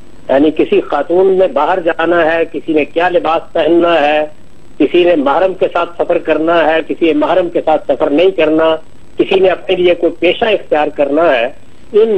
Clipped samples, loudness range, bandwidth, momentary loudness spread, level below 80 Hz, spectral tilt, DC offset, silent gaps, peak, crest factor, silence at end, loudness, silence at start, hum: under 0.1%; 1 LU; 8.4 kHz; 5 LU; -46 dBFS; -6.5 dB/octave; 4%; none; 0 dBFS; 12 dB; 0 s; -12 LUFS; 0.3 s; none